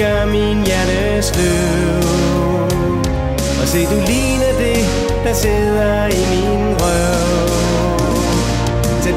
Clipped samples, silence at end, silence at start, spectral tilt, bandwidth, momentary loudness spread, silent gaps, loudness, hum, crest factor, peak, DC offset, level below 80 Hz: under 0.1%; 0 s; 0 s; -5 dB/octave; 16 kHz; 2 LU; none; -15 LUFS; none; 12 dB; -4 dBFS; under 0.1%; -22 dBFS